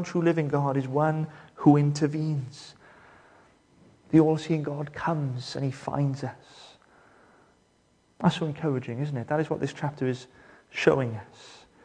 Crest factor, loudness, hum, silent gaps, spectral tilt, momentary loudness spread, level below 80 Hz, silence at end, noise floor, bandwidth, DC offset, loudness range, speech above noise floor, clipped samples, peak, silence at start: 22 dB; -27 LUFS; none; none; -7.5 dB/octave; 16 LU; -64 dBFS; 0.3 s; -65 dBFS; 9.6 kHz; under 0.1%; 6 LU; 39 dB; under 0.1%; -6 dBFS; 0 s